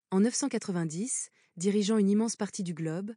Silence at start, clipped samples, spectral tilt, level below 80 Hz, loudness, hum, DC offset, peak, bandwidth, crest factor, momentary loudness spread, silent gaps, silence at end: 0.1 s; under 0.1%; -5 dB/octave; under -90 dBFS; -30 LUFS; none; under 0.1%; -16 dBFS; 10 kHz; 14 dB; 9 LU; none; 0 s